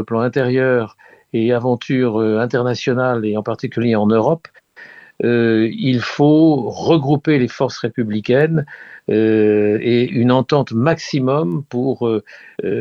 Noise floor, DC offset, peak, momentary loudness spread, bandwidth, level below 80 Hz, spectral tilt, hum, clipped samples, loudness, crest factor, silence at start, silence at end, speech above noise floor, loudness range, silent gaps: -41 dBFS; under 0.1%; 0 dBFS; 8 LU; 7.2 kHz; -58 dBFS; -7.5 dB/octave; none; under 0.1%; -17 LUFS; 16 dB; 0 s; 0 s; 25 dB; 2 LU; none